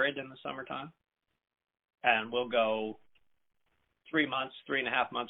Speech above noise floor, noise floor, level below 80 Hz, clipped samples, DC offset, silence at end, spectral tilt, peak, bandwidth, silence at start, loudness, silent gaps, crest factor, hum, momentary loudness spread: 44 dB; -77 dBFS; -76 dBFS; under 0.1%; under 0.1%; 0 s; -1 dB/octave; -12 dBFS; 4.1 kHz; 0 s; -32 LUFS; none; 24 dB; none; 13 LU